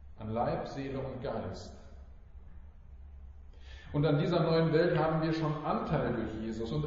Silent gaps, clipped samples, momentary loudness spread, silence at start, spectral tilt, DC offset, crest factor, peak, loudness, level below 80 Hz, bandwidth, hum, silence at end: none; under 0.1%; 24 LU; 0 s; -6.5 dB/octave; under 0.1%; 18 dB; -16 dBFS; -32 LUFS; -50 dBFS; 7.4 kHz; none; 0 s